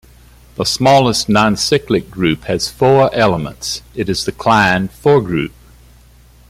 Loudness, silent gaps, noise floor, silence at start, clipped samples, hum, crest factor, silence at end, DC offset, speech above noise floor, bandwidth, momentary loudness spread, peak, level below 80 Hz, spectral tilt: -14 LUFS; none; -44 dBFS; 0.6 s; under 0.1%; none; 14 dB; 1 s; under 0.1%; 31 dB; 16 kHz; 10 LU; 0 dBFS; -40 dBFS; -4.5 dB/octave